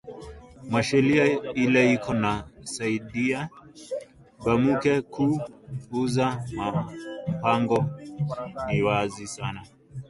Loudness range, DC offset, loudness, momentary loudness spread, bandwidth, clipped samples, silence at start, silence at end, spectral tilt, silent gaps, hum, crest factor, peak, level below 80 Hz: 4 LU; under 0.1%; -25 LUFS; 15 LU; 11.5 kHz; under 0.1%; 0.05 s; 0.05 s; -6 dB/octave; none; none; 18 dB; -6 dBFS; -52 dBFS